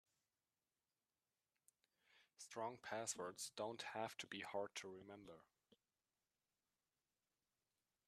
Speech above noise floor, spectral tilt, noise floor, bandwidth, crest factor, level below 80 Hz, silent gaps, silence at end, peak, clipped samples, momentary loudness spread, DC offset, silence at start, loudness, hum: over 39 dB; -2.5 dB/octave; under -90 dBFS; 13.5 kHz; 22 dB; under -90 dBFS; none; 2.65 s; -32 dBFS; under 0.1%; 13 LU; under 0.1%; 2.1 s; -50 LUFS; none